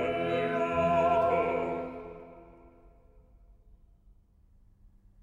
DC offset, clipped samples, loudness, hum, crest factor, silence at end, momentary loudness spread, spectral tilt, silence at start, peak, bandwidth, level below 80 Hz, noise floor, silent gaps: under 0.1%; under 0.1%; -29 LUFS; none; 16 dB; 2.55 s; 21 LU; -7 dB/octave; 0 s; -16 dBFS; 7.6 kHz; -58 dBFS; -61 dBFS; none